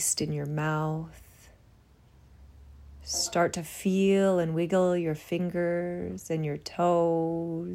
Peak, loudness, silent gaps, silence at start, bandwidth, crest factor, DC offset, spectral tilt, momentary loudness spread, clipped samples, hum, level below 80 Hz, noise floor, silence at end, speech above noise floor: -12 dBFS; -28 LUFS; none; 0 s; 16 kHz; 16 dB; under 0.1%; -5 dB/octave; 9 LU; under 0.1%; none; -58 dBFS; -58 dBFS; 0 s; 30 dB